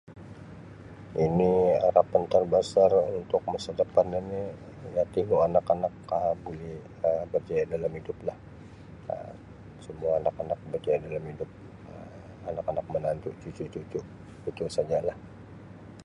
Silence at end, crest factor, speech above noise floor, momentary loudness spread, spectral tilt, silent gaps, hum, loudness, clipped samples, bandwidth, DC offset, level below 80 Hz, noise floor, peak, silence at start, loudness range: 0 s; 22 dB; 19 dB; 24 LU; -7 dB/octave; none; none; -28 LUFS; under 0.1%; 10.5 kHz; under 0.1%; -54 dBFS; -47 dBFS; -6 dBFS; 0.1 s; 9 LU